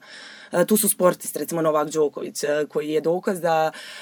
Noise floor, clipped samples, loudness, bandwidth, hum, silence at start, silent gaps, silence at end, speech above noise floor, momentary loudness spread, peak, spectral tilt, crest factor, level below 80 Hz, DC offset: -43 dBFS; under 0.1%; -22 LUFS; over 20 kHz; none; 0.05 s; none; 0 s; 20 dB; 9 LU; -4 dBFS; -4 dB/octave; 18 dB; -76 dBFS; under 0.1%